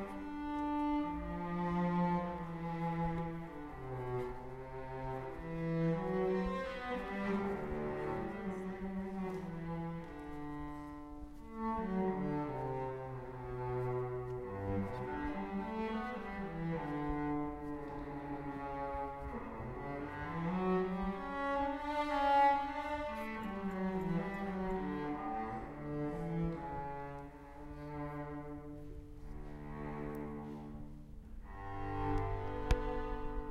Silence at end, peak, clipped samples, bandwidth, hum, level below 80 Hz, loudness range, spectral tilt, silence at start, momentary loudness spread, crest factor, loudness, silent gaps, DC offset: 0 s; -18 dBFS; under 0.1%; 13 kHz; none; -50 dBFS; 9 LU; -8 dB/octave; 0 s; 12 LU; 20 dB; -40 LUFS; none; under 0.1%